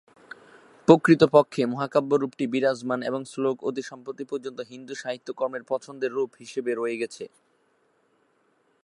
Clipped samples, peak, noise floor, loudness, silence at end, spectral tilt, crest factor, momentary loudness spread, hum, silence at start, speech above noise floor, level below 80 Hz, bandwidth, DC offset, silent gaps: under 0.1%; 0 dBFS; -67 dBFS; -25 LUFS; 1.6 s; -6.5 dB/octave; 24 dB; 19 LU; none; 0.9 s; 43 dB; -72 dBFS; 11.5 kHz; under 0.1%; none